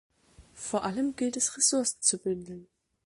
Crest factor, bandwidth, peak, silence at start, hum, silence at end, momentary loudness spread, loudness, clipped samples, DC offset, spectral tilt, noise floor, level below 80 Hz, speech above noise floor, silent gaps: 20 dB; 11.5 kHz; -12 dBFS; 0.4 s; none; 0.4 s; 16 LU; -28 LUFS; under 0.1%; under 0.1%; -2.5 dB/octave; -57 dBFS; -66 dBFS; 28 dB; none